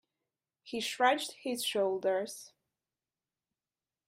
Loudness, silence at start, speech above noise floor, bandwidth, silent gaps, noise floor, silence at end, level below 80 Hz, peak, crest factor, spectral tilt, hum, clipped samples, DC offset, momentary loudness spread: -33 LUFS; 0.65 s; over 57 dB; 15.5 kHz; none; under -90 dBFS; 1.6 s; -84 dBFS; -14 dBFS; 22 dB; -2 dB/octave; none; under 0.1%; under 0.1%; 13 LU